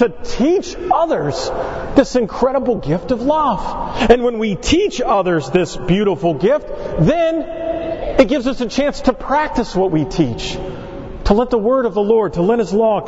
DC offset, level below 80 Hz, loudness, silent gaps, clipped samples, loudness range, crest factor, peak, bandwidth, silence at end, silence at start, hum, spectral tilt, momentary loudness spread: under 0.1%; -32 dBFS; -17 LUFS; none; under 0.1%; 2 LU; 16 dB; 0 dBFS; 8 kHz; 0 s; 0 s; none; -6 dB/octave; 8 LU